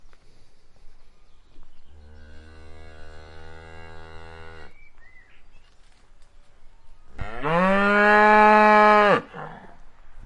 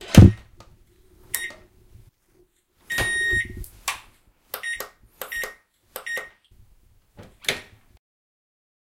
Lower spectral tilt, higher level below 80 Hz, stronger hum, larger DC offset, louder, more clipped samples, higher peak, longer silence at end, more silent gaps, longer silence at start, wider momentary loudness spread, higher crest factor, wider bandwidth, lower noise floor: about the same, -6 dB/octave vs -5.5 dB/octave; second, -46 dBFS vs -36 dBFS; neither; neither; first, -17 LUFS vs -23 LUFS; neither; about the same, -2 dBFS vs 0 dBFS; second, 0 s vs 1.35 s; neither; about the same, 0.05 s vs 0 s; first, 25 LU vs 20 LU; about the same, 22 dB vs 24 dB; second, 11 kHz vs 17 kHz; second, -49 dBFS vs -62 dBFS